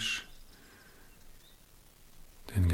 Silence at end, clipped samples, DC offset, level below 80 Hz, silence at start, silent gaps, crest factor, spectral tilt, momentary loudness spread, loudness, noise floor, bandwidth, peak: 0 s; under 0.1%; under 0.1%; -50 dBFS; 0 s; none; 20 dB; -4.5 dB/octave; 24 LU; -35 LUFS; -58 dBFS; 16.5 kHz; -18 dBFS